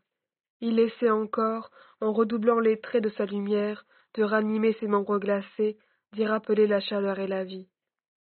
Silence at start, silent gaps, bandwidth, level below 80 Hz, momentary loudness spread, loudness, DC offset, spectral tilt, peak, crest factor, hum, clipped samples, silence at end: 0.6 s; none; 4.5 kHz; -76 dBFS; 9 LU; -27 LUFS; under 0.1%; -5 dB/octave; -10 dBFS; 18 dB; none; under 0.1%; 0.6 s